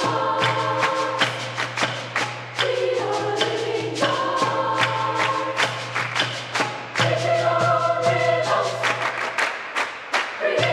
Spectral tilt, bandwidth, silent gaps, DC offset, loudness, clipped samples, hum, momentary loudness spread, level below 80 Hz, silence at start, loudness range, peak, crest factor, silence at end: -3.5 dB/octave; 14 kHz; none; under 0.1%; -22 LUFS; under 0.1%; none; 5 LU; -68 dBFS; 0 s; 2 LU; -4 dBFS; 18 dB; 0 s